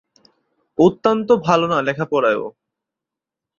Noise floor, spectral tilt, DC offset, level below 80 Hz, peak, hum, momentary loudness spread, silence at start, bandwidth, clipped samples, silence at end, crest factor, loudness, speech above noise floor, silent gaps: -86 dBFS; -6.5 dB/octave; under 0.1%; -58 dBFS; -2 dBFS; none; 9 LU; 0.8 s; 7.2 kHz; under 0.1%; 1.1 s; 18 dB; -17 LUFS; 69 dB; none